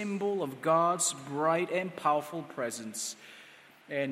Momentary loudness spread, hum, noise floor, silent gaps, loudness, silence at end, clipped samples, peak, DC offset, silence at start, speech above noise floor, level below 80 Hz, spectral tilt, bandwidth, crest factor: 12 LU; none; -55 dBFS; none; -31 LUFS; 0 s; under 0.1%; -14 dBFS; under 0.1%; 0 s; 24 dB; -82 dBFS; -3.5 dB/octave; 16 kHz; 18 dB